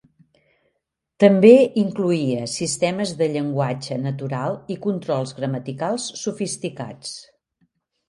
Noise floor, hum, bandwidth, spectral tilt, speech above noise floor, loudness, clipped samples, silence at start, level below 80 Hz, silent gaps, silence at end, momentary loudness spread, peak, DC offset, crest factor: -77 dBFS; none; 11.5 kHz; -5.5 dB/octave; 57 dB; -20 LUFS; under 0.1%; 1.2 s; -64 dBFS; none; 0.85 s; 15 LU; 0 dBFS; under 0.1%; 20 dB